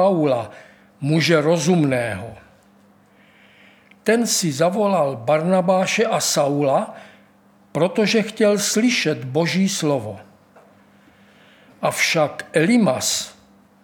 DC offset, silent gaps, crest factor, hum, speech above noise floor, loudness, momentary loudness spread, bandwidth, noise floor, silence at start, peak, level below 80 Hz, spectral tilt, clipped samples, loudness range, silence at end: under 0.1%; none; 18 dB; none; 35 dB; -19 LUFS; 10 LU; 19.5 kHz; -53 dBFS; 0 s; -2 dBFS; -66 dBFS; -4.5 dB/octave; under 0.1%; 4 LU; 0.5 s